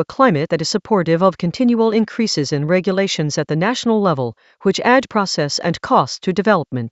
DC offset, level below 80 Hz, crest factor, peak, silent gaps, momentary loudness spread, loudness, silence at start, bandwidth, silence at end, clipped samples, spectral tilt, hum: under 0.1%; -56 dBFS; 16 dB; 0 dBFS; none; 5 LU; -17 LUFS; 0 s; 8.2 kHz; 0.05 s; under 0.1%; -5 dB/octave; none